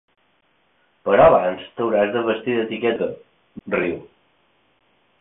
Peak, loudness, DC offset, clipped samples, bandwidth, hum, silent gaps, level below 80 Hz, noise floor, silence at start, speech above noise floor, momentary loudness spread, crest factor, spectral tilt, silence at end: -2 dBFS; -20 LUFS; under 0.1%; under 0.1%; 3.9 kHz; none; none; -52 dBFS; -64 dBFS; 1.05 s; 45 dB; 16 LU; 20 dB; -10.5 dB/octave; 1.2 s